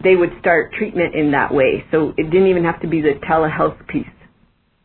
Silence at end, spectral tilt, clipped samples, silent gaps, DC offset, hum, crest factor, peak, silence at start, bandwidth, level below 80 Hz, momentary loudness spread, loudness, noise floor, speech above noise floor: 0.75 s; -11 dB/octave; under 0.1%; none; under 0.1%; none; 16 dB; -2 dBFS; 0 s; 4.3 kHz; -44 dBFS; 7 LU; -17 LUFS; -58 dBFS; 42 dB